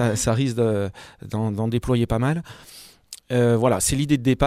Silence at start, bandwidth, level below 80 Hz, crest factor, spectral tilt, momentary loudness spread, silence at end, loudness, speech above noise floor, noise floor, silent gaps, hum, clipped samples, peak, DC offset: 0 s; 16 kHz; -40 dBFS; 16 dB; -5.5 dB/octave; 22 LU; 0 s; -22 LUFS; 23 dB; -45 dBFS; none; none; under 0.1%; -6 dBFS; under 0.1%